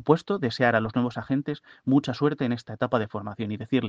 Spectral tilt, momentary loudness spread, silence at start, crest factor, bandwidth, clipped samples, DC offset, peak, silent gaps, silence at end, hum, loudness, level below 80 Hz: -7.5 dB/octave; 10 LU; 0 s; 22 dB; 7.8 kHz; under 0.1%; under 0.1%; -4 dBFS; none; 0 s; none; -26 LUFS; -62 dBFS